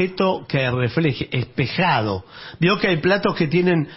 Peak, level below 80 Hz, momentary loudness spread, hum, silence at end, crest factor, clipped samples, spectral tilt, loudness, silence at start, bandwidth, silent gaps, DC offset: -6 dBFS; -50 dBFS; 7 LU; none; 0 s; 14 dB; under 0.1%; -10 dB/octave; -20 LUFS; 0 s; 5.8 kHz; none; under 0.1%